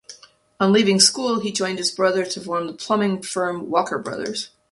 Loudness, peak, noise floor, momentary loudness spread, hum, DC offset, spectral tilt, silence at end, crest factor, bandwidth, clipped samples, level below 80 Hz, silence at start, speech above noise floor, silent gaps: -20 LUFS; -2 dBFS; -47 dBFS; 12 LU; none; under 0.1%; -3 dB/octave; 0.25 s; 20 dB; 11.5 kHz; under 0.1%; -66 dBFS; 0.1 s; 27 dB; none